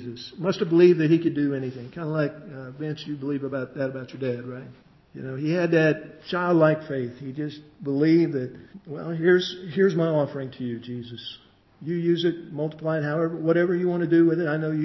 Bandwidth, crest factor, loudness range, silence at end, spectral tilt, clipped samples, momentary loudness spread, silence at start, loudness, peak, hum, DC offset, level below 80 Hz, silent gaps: 6 kHz; 18 dB; 6 LU; 0 s; -8 dB/octave; under 0.1%; 16 LU; 0 s; -24 LUFS; -6 dBFS; none; under 0.1%; -66 dBFS; none